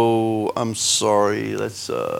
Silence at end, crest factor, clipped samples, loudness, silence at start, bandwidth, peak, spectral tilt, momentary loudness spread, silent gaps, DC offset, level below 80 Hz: 0 s; 16 dB; under 0.1%; -20 LUFS; 0 s; 17 kHz; -6 dBFS; -3.5 dB/octave; 9 LU; none; under 0.1%; -62 dBFS